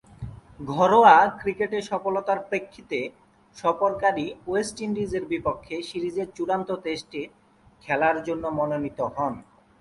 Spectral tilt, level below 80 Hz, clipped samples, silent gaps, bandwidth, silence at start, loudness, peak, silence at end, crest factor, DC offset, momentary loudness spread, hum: -5.5 dB/octave; -56 dBFS; under 0.1%; none; 11.5 kHz; 0.2 s; -24 LUFS; -2 dBFS; 0.4 s; 22 dB; under 0.1%; 15 LU; none